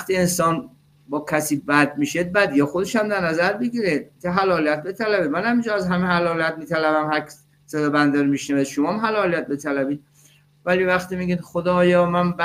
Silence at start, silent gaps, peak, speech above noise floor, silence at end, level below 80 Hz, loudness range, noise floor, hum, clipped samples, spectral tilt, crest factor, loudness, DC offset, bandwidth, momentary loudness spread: 0 s; none; -2 dBFS; 34 dB; 0 s; -56 dBFS; 2 LU; -54 dBFS; none; under 0.1%; -5.5 dB/octave; 18 dB; -21 LUFS; under 0.1%; 16 kHz; 7 LU